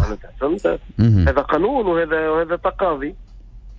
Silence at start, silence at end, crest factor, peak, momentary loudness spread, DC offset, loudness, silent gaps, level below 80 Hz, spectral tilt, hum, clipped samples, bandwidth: 0 s; 0 s; 14 dB; -4 dBFS; 9 LU; under 0.1%; -19 LUFS; none; -30 dBFS; -9 dB/octave; none; under 0.1%; 7.4 kHz